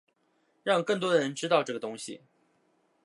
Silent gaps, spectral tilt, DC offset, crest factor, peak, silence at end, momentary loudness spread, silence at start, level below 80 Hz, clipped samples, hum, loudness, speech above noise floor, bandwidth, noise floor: none; -4 dB/octave; under 0.1%; 22 dB; -10 dBFS; 0.9 s; 14 LU; 0.65 s; -84 dBFS; under 0.1%; none; -28 LUFS; 43 dB; 11.5 kHz; -72 dBFS